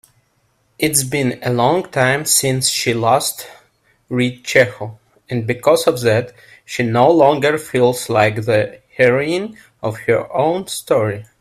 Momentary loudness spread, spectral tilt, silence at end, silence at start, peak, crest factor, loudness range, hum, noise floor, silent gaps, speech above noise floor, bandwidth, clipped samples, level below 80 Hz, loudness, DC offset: 12 LU; -4 dB/octave; 0.15 s; 0.8 s; 0 dBFS; 16 dB; 3 LU; none; -62 dBFS; none; 46 dB; 16 kHz; under 0.1%; -54 dBFS; -16 LUFS; under 0.1%